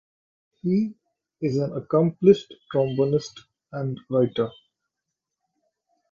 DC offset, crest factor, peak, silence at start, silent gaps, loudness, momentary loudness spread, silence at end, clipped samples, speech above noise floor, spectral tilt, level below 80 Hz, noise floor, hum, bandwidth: under 0.1%; 22 dB; -4 dBFS; 0.65 s; none; -24 LUFS; 13 LU; 1.6 s; under 0.1%; 61 dB; -8 dB/octave; -64 dBFS; -84 dBFS; none; 7.2 kHz